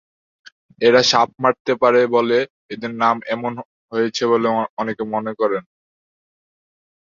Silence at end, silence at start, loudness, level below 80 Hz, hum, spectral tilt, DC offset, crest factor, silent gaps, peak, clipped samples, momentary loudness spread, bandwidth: 1.4 s; 0.8 s; -18 LUFS; -64 dBFS; none; -4 dB/octave; under 0.1%; 18 dB; 1.60-1.65 s, 2.50-2.69 s, 3.65-3.89 s, 4.69-4.77 s; -2 dBFS; under 0.1%; 13 LU; 7.4 kHz